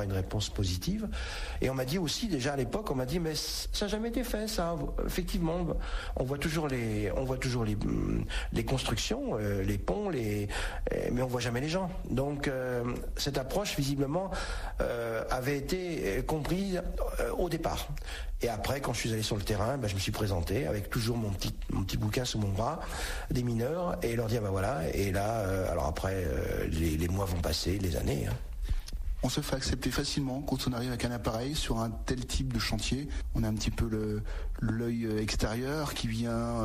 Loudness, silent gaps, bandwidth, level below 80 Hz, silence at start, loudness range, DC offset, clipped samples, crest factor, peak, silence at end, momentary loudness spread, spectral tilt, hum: -33 LUFS; none; 15 kHz; -38 dBFS; 0 s; 1 LU; under 0.1%; under 0.1%; 14 dB; -18 dBFS; 0 s; 4 LU; -5 dB/octave; none